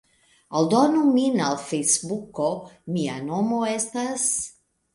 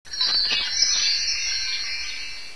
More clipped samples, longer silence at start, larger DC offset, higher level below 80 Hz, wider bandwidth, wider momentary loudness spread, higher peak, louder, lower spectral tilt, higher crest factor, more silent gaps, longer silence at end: neither; first, 0.5 s vs 0.05 s; second, under 0.1% vs 2%; second, -66 dBFS vs -52 dBFS; about the same, 11.5 kHz vs 11 kHz; about the same, 10 LU vs 10 LU; about the same, -6 dBFS vs -6 dBFS; about the same, -23 LUFS vs -21 LUFS; first, -4 dB/octave vs 2.5 dB/octave; about the same, 18 dB vs 18 dB; neither; first, 0.45 s vs 0 s